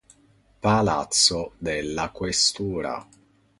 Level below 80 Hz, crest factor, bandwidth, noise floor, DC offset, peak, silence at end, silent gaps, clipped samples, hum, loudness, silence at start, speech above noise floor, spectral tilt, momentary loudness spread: -48 dBFS; 20 dB; 11.5 kHz; -59 dBFS; under 0.1%; -4 dBFS; 0.55 s; none; under 0.1%; none; -23 LUFS; 0.65 s; 35 dB; -3 dB/octave; 11 LU